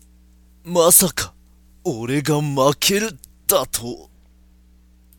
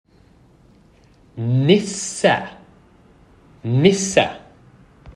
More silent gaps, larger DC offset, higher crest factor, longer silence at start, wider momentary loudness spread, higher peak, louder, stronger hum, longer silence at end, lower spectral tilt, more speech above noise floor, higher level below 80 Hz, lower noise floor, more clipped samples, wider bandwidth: neither; neither; about the same, 22 dB vs 20 dB; second, 0.65 s vs 1.35 s; about the same, 17 LU vs 19 LU; about the same, 0 dBFS vs 0 dBFS; about the same, -18 LUFS vs -18 LUFS; first, 60 Hz at -50 dBFS vs none; first, 1.15 s vs 0.05 s; second, -3 dB/octave vs -5 dB/octave; about the same, 33 dB vs 35 dB; first, -48 dBFS vs -54 dBFS; about the same, -51 dBFS vs -52 dBFS; neither; first, 17.5 kHz vs 11.5 kHz